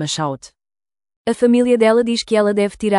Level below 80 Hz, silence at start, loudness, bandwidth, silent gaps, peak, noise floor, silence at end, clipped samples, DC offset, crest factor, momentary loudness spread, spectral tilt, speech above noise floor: -54 dBFS; 0 s; -16 LUFS; 11.5 kHz; 1.17-1.25 s; -2 dBFS; under -90 dBFS; 0 s; under 0.1%; under 0.1%; 14 dB; 11 LU; -5 dB/octave; over 74 dB